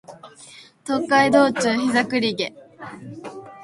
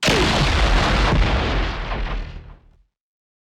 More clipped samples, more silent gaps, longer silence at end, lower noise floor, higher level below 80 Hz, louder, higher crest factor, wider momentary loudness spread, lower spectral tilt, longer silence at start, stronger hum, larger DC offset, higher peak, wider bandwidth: neither; neither; second, 0 s vs 0.9 s; second, -46 dBFS vs -53 dBFS; second, -64 dBFS vs -24 dBFS; about the same, -19 LUFS vs -20 LUFS; first, 20 dB vs 12 dB; first, 22 LU vs 12 LU; about the same, -4 dB/octave vs -4.5 dB/octave; about the same, 0.1 s vs 0 s; neither; neither; first, -2 dBFS vs -6 dBFS; second, 11.5 kHz vs 13 kHz